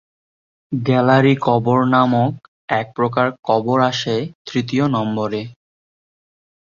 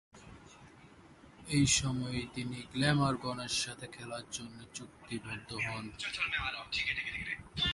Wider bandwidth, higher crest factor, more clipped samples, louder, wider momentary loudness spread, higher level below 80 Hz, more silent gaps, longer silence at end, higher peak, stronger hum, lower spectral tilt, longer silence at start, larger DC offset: second, 7.2 kHz vs 11.5 kHz; second, 16 dB vs 22 dB; neither; first, -18 LUFS vs -34 LUFS; second, 10 LU vs 17 LU; about the same, -58 dBFS vs -56 dBFS; first, 2.48-2.68 s, 3.39-3.43 s, 4.35-4.45 s vs none; first, 1.15 s vs 0 s; first, -2 dBFS vs -14 dBFS; neither; first, -7 dB/octave vs -3.5 dB/octave; first, 0.7 s vs 0.15 s; neither